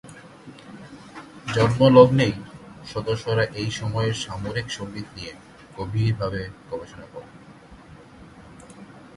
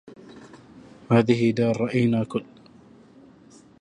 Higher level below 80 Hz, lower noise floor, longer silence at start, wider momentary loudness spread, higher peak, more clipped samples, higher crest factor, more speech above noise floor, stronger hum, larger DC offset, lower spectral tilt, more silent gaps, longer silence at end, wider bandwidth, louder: first, -48 dBFS vs -60 dBFS; second, -46 dBFS vs -51 dBFS; about the same, 0.05 s vs 0.05 s; first, 27 LU vs 9 LU; first, 0 dBFS vs -6 dBFS; neither; about the same, 24 dB vs 20 dB; second, 25 dB vs 30 dB; neither; neither; about the same, -6.5 dB/octave vs -7.5 dB/octave; neither; second, 0.15 s vs 1.4 s; first, 11.5 kHz vs 10 kHz; about the same, -22 LUFS vs -22 LUFS